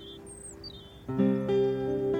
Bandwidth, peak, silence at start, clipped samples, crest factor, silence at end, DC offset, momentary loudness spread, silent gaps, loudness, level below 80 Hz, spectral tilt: 9.4 kHz; -14 dBFS; 0 s; under 0.1%; 16 dB; 0 s; under 0.1%; 17 LU; none; -28 LUFS; -54 dBFS; -7 dB/octave